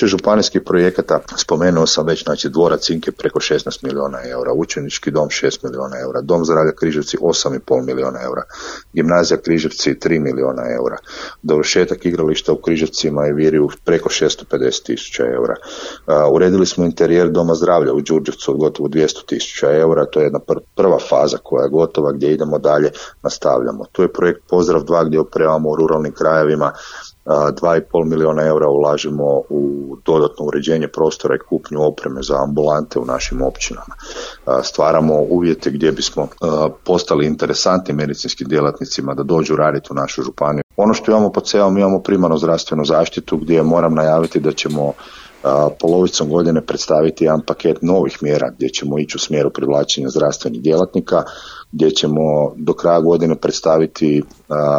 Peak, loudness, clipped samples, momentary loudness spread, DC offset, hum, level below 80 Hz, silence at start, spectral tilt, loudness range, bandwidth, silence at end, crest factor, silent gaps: -2 dBFS; -16 LUFS; under 0.1%; 8 LU; under 0.1%; none; -42 dBFS; 0 s; -5 dB/octave; 3 LU; 8.8 kHz; 0 s; 14 dB; 40.63-40.69 s